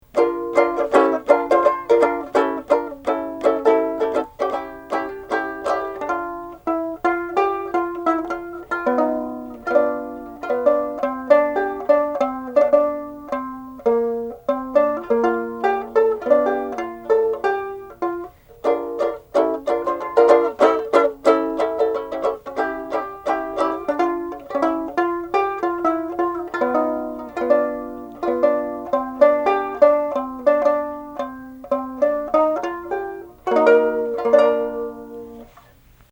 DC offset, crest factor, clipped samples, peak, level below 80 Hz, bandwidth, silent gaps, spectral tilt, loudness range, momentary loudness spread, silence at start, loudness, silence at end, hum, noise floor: under 0.1%; 20 dB; under 0.1%; 0 dBFS; -54 dBFS; 16.5 kHz; none; -5.5 dB/octave; 4 LU; 12 LU; 0.15 s; -20 LUFS; 0.65 s; none; -50 dBFS